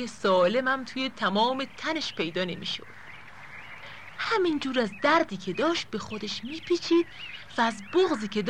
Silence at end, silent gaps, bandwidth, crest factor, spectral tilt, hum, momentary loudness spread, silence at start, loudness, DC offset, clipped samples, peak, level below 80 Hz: 0 s; none; 10.5 kHz; 16 dB; -4.5 dB/octave; none; 19 LU; 0 s; -27 LUFS; 0.4%; under 0.1%; -12 dBFS; -64 dBFS